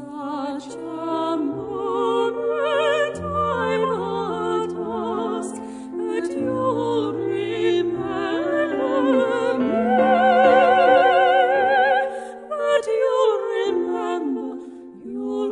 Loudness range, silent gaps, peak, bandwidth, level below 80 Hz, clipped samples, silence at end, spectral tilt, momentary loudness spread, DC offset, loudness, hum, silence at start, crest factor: 8 LU; none; -4 dBFS; 10.5 kHz; -62 dBFS; under 0.1%; 0 s; -5.5 dB/octave; 15 LU; under 0.1%; -21 LUFS; none; 0 s; 18 dB